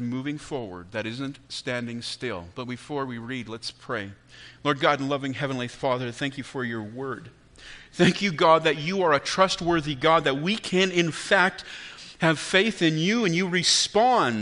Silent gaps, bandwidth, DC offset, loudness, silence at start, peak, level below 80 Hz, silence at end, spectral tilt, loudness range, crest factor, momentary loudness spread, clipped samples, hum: none; 10.5 kHz; under 0.1%; -24 LUFS; 0 s; -4 dBFS; -58 dBFS; 0 s; -4 dB/octave; 10 LU; 22 dB; 15 LU; under 0.1%; none